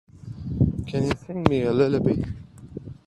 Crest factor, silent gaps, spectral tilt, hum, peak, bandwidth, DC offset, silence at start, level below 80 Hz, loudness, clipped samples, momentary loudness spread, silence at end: 24 dB; none; -8 dB/octave; none; -2 dBFS; 11 kHz; under 0.1%; 0.15 s; -44 dBFS; -24 LUFS; under 0.1%; 19 LU; 0.15 s